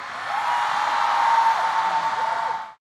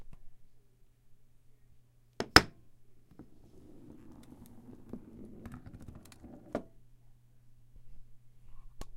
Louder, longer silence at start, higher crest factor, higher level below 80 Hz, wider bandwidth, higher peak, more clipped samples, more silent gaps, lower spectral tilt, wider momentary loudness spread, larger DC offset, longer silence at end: first, -22 LUFS vs -28 LUFS; about the same, 0 s vs 0 s; second, 14 dB vs 38 dB; second, -76 dBFS vs -54 dBFS; second, 13.5 kHz vs 16 kHz; second, -8 dBFS vs 0 dBFS; neither; neither; second, -1 dB/octave vs -3 dB/octave; second, 8 LU vs 31 LU; neither; first, 0.2 s vs 0 s